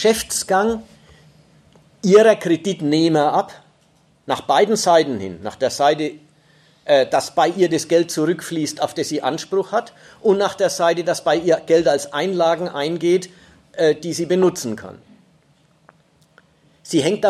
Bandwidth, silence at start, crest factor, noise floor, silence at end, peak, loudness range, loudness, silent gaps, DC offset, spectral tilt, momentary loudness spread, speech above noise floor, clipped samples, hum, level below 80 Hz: 14.5 kHz; 0 s; 16 dB; -57 dBFS; 0 s; -2 dBFS; 4 LU; -18 LUFS; none; under 0.1%; -4.5 dB/octave; 10 LU; 39 dB; under 0.1%; none; -58 dBFS